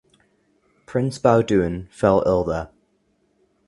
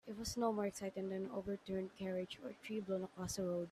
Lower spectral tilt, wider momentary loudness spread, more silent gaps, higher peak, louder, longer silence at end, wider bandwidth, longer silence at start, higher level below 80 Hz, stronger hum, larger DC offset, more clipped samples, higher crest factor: first, -7.5 dB/octave vs -5 dB/octave; first, 10 LU vs 7 LU; neither; first, -2 dBFS vs -26 dBFS; first, -20 LUFS vs -43 LUFS; first, 1 s vs 0 s; second, 11.5 kHz vs 15.5 kHz; first, 0.9 s vs 0.05 s; first, -44 dBFS vs -68 dBFS; neither; neither; neither; about the same, 20 dB vs 18 dB